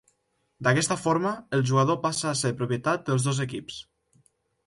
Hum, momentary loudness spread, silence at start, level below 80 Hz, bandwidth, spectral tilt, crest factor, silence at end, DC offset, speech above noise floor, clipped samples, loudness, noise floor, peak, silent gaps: none; 9 LU; 0.6 s; -64 dBFS; 11.5 kHz; -5 dB/octave; 18 dB; 0.85 s; under 0.1%; 48 dB; under 0.1%; -26 LUFS; -73 dBFS; -8 dBFS; none